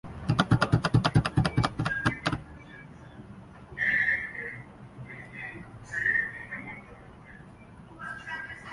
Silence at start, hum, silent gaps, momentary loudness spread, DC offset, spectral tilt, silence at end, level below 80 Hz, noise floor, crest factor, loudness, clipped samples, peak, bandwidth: 0.05 s; none; none; 24 LU; under 0.1%; -6 dB/octave; 0 s; -48 dBFS; -49 dBFS; 24 dB; -28 LUFS; under 0.1%; -6 dBFS; 11.5 kHz